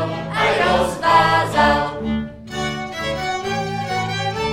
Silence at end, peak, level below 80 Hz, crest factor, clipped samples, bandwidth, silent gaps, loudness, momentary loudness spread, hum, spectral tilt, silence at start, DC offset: 0 s; -2 dBFS; -40 dBFS; 18 dB; under 0.1%; 17 kHz; none; -19 LUFS; 10 LU; none; -4.5 dB/octave; 0 s; under 0.1%